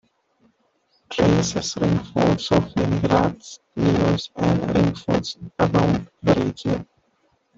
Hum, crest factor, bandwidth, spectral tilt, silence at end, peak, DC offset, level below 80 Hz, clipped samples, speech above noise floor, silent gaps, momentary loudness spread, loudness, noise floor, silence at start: none; 18 dB; 7.8 kHz; -6 dB/octave; 0.75 s; -4 dBFS; under 0.1%; -44 dBFS; under 0.1%; 45 dB; none; 8 LU; -21 LUFS; -65 dBFS; 1.1 s